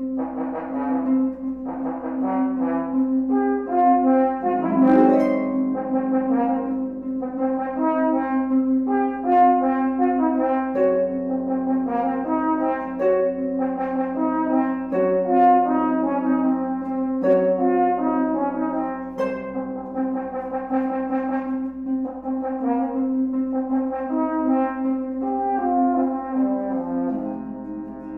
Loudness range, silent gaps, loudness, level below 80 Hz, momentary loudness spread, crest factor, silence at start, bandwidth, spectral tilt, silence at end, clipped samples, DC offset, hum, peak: 5 LU; none; -22 LUFS; -54 dBFS; 10 LU; 16 dB; 0 s; 3.3 kHz; -9.5 dB/octave; 0 s; under 0.1%; under 0.1%; none; -6 dBFS